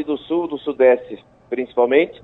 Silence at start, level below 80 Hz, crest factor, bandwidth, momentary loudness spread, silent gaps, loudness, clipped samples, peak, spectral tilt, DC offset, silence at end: 0 s; -60 dBFS; 16 dB; 4.1 kHz; 15 LU; none; -19 LUFS; under 0.1%; -2 dBFS; -7.5 dB/octave; under 0.1%; 0.1 s